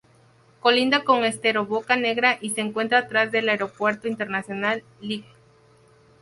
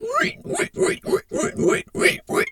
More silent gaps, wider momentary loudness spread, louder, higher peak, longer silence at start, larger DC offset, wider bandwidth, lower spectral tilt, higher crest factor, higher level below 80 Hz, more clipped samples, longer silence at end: neither; first, 9 LU vs 6 LU; about the same, -22 LUFS vs -22 LUFS; about the same, -4 dBFS vs -2 dBFS; first, 0.65 s vs 0 s; neither; second, 11.5 kHz vs 17.5 kHz; about the same, -3.5 dB/octave vs -3.5 dB/octave; about the same, 20 dB vs 20 dB; second, -68 dBFS vs -54 dBFS; neither; first, 1 s vs 0 s